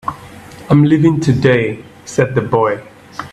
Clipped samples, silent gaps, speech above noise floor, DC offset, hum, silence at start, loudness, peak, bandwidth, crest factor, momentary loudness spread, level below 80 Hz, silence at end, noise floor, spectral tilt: under 0.1%; none; 23 dB; under 0.1%; none; 0.05 s; -14 LUFS; 0 dBFS; 11.5 kHz; 14 dB; 19 LU; -46 dBFS; 0.05 s; -35 dBFS; -7.5 dB/octave